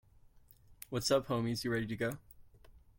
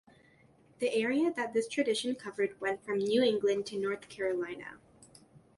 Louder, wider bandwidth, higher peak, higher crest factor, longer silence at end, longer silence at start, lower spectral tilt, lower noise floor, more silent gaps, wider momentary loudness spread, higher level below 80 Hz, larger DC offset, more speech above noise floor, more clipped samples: second, -35 LUFS vs -32 LUFS; first, 17 kHz vs 11.5 kHz; about the same, -18 dBFS vs -16 dBFS; about the same, 18 dB vs 16 dB; about the same, 0.2 s vs 0.2 s; about the same, 0.7 s vs 0.8 s; about the same, -5 dB/octave vs -4 dB/octave; about the same, -62 dBFS vs -63 dBFS; neither; first, 13 LU vs 9 LU; first, -62 dBFS vs -74 dBFS; neither; second, 27 dB vs 31 dB; neither